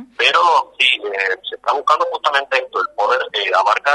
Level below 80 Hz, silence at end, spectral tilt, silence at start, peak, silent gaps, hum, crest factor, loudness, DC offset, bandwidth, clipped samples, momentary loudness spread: -68 dBFS; 0 s; 0.5 dB/octave; 0 s; 0 dBFS; none; none; 16 dB; -16 LUFS; under 0.1%; 11.5 kHz; under 0.1%; 6 LU